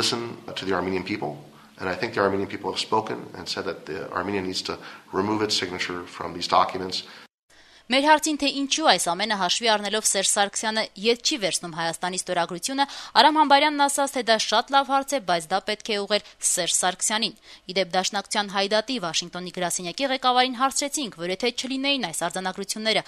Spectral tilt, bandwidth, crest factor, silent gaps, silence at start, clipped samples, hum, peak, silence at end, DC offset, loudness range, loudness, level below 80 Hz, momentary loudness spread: -2 dB/octave; 13.5 kHz; 24 dB; 7.34-7.48 s; 0 s; under 0.1%; none; -2 dBFS; 0.05 s; under 0.1%; 7 LU; -24 LUFS; -64 dBFS; 11 LU